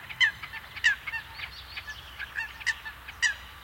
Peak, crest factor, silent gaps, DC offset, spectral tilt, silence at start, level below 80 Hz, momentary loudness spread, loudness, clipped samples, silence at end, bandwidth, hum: -12 dBFS; 22 dB; none; under 0.1%; 0.5 dB/octave; 0 s; -54 dBFS; 14 LU; -30 LUFS; under 0.1%; 0 s; 16.5 kHz; none